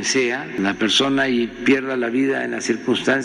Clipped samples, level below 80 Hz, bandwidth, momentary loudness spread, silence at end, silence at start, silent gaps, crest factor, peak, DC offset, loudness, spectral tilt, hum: under 0.1%; -54 dBFS; 11.5 kHz; 6 LU; 0 s; 0 s; none; 14 dB; -4 dBFS; under 0.1%; -19 LUFS; -3.5 dB/octave; none